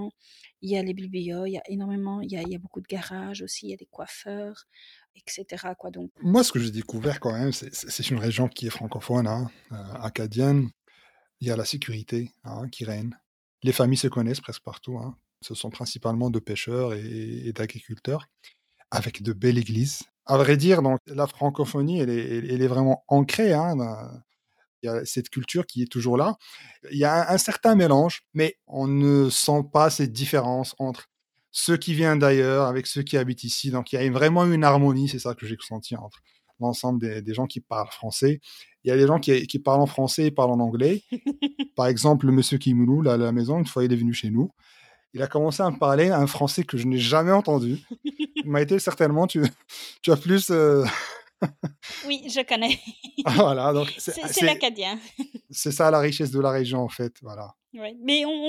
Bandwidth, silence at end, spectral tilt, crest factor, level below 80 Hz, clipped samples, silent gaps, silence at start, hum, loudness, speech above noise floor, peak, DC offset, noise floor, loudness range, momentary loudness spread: 16 kHz; 0 s; -5.5 dB/octave; 22 dB; -64 dBFS; under 0.1%; 5.10-5.14 s, 6.10-6.15 s, 13.26-13.58 s, 21.00-21.05 s, 24.68-24.82 s; 0 s; none; -24 LUFS; 37 dB; -2 dBFS; under 0.1%; -61 dBFS; 8 LU; 16 LU